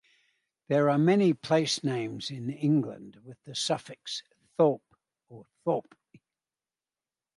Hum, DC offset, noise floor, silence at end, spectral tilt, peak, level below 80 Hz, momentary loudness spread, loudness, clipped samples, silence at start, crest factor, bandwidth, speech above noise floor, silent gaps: none; under 0.1%; under -90 dBFS; 1.6 s; -5.5 dB/octave; -12 dBFS; -76 dBFS; 15 LU; -28 LUFS; under 0.1%; 0.7 s; 18 dB; 11.5 kHz; over 62 dB; none